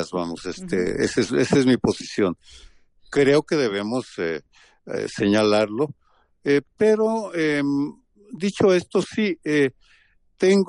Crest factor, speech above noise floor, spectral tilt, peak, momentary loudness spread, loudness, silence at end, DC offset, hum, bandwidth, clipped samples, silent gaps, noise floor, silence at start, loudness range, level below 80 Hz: 16 dB; 37 dB; -5.5 dB/octave; -6 dBFS; 11 LU; -22 LUFS; 0 s; under 0.1%; none; 11 kHz; under 0.1%; none; -58 dBFS; 0 s; 2 LU; -54 dBFS